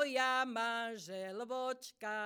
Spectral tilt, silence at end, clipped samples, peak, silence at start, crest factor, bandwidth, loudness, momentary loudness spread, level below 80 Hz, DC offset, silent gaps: -2.5 dB/octave; 0 s; under 0.1%; -20 dBFS; 0 s; 18 dB; over 20 kHz; -38 LUFS; 11 LU; under -90 dBFS; under 0.1%; none